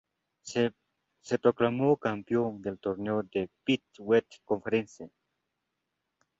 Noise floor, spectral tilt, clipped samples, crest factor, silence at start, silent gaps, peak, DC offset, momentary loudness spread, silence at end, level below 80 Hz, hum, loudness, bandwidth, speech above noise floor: -83 dBFS; -6 dB/octave; under 0.1%; 22 dB; 0.45 s; none; -10 dBFS; under 0.1%; 9 LU; 1.3 s; -68 dBFS; none; -30 LUFS; 8 kHz; 54 dB